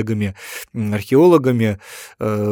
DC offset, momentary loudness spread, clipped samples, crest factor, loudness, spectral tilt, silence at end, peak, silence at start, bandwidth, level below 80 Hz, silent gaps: under 0.1%; 17 LU; under 0.1%; 16 dB; -17 LUFS; -7 dB/octave; 0 s; -2 dBFS; 0 s; 18 kHz; -58 dBFS; none